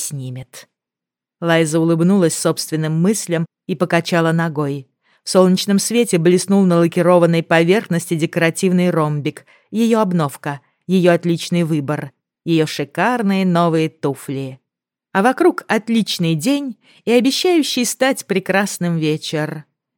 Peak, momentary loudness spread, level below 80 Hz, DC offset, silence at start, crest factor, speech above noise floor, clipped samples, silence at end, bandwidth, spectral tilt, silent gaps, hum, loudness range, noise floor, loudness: 0 dBFS; 12 LU; -68 dBFS; under 0.1%; 0 s; 16 dB; 70 dB; under 0.1%; 0.35 s; 17.5 kHz; -5.5 dB/octave; none; none; 4 LU; -87 dBFS; -17 LUFS